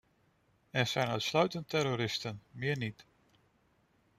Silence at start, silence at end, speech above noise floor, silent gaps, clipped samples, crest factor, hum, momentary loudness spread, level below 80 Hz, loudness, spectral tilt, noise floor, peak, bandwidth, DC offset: 0.75 s; 1.15 s; 38 dB; none; under 0.1%; 22 dB; none; 8 LU; -70 dBFS; -34 LUFS; -4.5 dB/octave; -71 dBFS; -14 dBFS; 15.5 kHz; under 0.1%